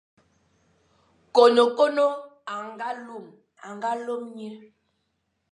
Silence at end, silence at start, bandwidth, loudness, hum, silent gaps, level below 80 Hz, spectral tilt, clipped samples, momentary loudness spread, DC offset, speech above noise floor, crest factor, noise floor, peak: 0.95 s; 1.35 s; 10.5 kHz; -23 LUFS; none; none; -80 dBFS; -4 dB/octave; under 0.1%; 23 LU; under 0.1%; 52 dB; 22 dB; -75 dBFS; -4 dBFS